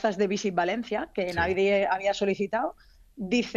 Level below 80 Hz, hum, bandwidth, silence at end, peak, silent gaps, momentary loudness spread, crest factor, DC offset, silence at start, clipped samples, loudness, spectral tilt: -54 dBFS; none; 9.6 kHz; 0 s; -10 dBFS; none; 7 LU; 16 dB; under 0.1%; 0 s; under 0.1%; -27 LUFS; -5 dB/octave